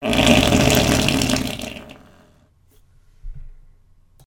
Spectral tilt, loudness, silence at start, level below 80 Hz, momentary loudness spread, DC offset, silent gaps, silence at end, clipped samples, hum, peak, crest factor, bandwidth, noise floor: -4 dB/octave; -16 LUFS; 0 s; -34 dBFS; 17 LU; under 0.1%; none; 0.75 s; under 0.1%; none; 0 dBFS; 20 dB; 19 kHz; -55 dBFS